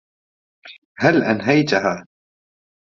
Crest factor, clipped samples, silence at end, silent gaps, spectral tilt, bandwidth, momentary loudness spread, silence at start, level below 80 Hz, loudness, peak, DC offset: 20 dB; under 0.1%; 0.95 s; 0.78-0.95 s; -4.5 dB/octave; 7.4 kHz; 7 LU; 0.65 s; -62 dBFS; -18 LUFS; -2 dBFS; under 0.1%